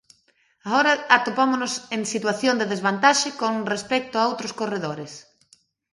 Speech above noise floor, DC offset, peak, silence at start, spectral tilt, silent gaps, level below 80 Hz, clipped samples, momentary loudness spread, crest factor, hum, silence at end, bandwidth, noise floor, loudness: 42 dB; under 0.1%; 0 dBFS; 0.65 s; -3 dB/octave; none; -70 dBFS; under 0.1%; 11 LU; 24 dB; none; 0.75 s; 11.5 kHz; -64 dBFS; -22 LUFS